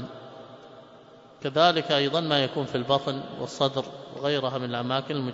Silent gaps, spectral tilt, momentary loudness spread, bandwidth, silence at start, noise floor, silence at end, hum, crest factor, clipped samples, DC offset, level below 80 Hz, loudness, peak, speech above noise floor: none; -5.5 dB/octave; 18 LU; 8 kHz; 0 s; -50 dBFS; 0 s; none; 22 dB; under 0.1%; under 0.1%; -68 dBFS; -26 LUFS; -6 dBFS; 25 dB